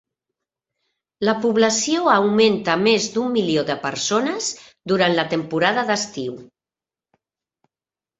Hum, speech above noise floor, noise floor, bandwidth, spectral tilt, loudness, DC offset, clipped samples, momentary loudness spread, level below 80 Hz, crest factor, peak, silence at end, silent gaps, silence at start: none; over 71 dB; under -90 dBFS; 8.4 kHz; -3.5 dB/octave; -19 LUFS; under 0.1%; under 0.1%; 10 LU; -62 dBFS; 20 dB; -2 dBFS; 1.75 s; none; 1.2 s